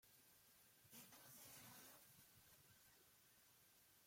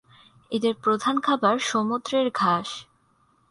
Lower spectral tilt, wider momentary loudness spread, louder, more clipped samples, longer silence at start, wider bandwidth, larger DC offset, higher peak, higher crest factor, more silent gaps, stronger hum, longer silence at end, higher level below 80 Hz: second, -2 dB/octave vs -4.5 dB/octave; about the same, 9 LU vs 7 LU; second, -64 LUFS vs -24 LUFS; neither; second, 0 s vs 0.5 s; first, 16.5 kHz vs 11.5 kHz; neither; second, -50 dBFS vs -6 dBFS; about the same, 18 dB vs 20 dB; neither; neither; second, 0 s vs 0.65 s; second, under -90 dBFS vs -68 dBFS